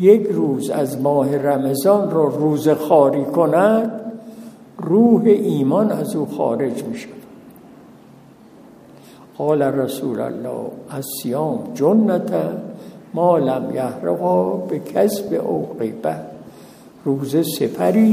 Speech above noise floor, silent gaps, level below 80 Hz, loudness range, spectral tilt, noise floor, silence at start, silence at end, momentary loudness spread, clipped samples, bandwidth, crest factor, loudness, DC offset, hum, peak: 28 dB; none; -66 dBFS; 8 LU; -7 dB/octave; -45 dBFS; 0 s; 0 s; 16 LU; under 0.1%; 15.5 kHz; 18 dB; -18 LUFS; under 0.1%; none; 0 dBFS